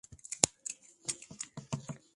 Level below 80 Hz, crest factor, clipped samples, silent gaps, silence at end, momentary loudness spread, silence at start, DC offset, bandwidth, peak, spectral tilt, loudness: -66 dBFS; 36 dB; under 0.1%; none; 0.2 s; 14 LU; 0.1 s; under 0.1%; 11.5 kHz; -2 dBFS; -2 dB/octave; -36 LUFS